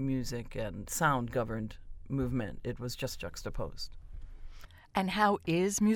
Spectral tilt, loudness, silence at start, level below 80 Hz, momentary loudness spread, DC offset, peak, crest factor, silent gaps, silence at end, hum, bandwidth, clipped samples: -5 dB/octave; -34 LUFS; 0 s; -46 dBFS; 24 LU; under 0.1%; -14 dBFS; 20 dB; none; 0 s; none; 17.5 kHz; under 0.1%